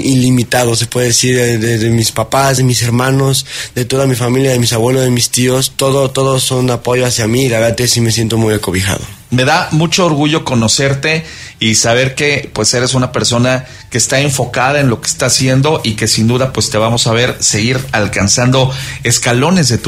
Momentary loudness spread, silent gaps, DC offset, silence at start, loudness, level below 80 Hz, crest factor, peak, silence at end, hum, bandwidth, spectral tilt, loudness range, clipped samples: 4 LU; none; under 0.1%; 0 s; -11 LUFS; -38 dBFS; 12 dB; 0 dBFS; 0 s; none; 16 kHz; -4 dB/octave; 1 LU; under 0.1%